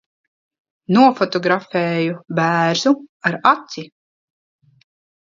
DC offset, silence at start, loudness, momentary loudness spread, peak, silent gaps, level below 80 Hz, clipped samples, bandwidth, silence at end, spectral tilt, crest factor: under 0.1%; 0.9 s; -17 LUFS; 8 LU; 0 dBFS; 3.09-3.20 s; -68 dBFS; under 0.1%; 7.6 kHz; 1.35 s; -5.5 dB/octave; 20 dB